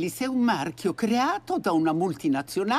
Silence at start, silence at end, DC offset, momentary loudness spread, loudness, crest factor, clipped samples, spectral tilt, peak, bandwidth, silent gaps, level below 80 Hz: 0 s; 0 s; under 0.1%; 3 LU; -26 LUFS; 14 dB; under 0.1%; -5 dB/octave; -12 dBFS; 15.5 kHz; none; -64 dBFS